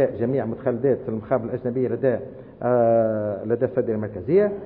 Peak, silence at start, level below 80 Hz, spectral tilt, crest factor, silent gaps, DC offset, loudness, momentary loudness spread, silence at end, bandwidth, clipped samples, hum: -8 dBFS; 0 s; -56 dBFS; -13 dB/octave; 14 dB; none; under 0.1%; -23 LUFS; 7 LU; 0 s; 4.3 kHz; under 0.1%; none